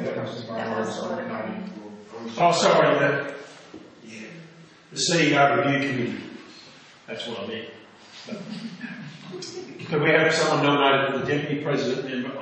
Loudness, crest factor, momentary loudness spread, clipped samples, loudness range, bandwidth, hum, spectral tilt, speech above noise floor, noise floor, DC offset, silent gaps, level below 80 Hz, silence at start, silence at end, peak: -23 LUFS; 20 dB; 22 LU; under 0.1%; 12 LU; 8.8 kHz; none; -4.5 dB/octave; 26 dB; -48 dBFS; under 0.1%; none; -70 dBFS; 0 s; 0 s; -4 dBFS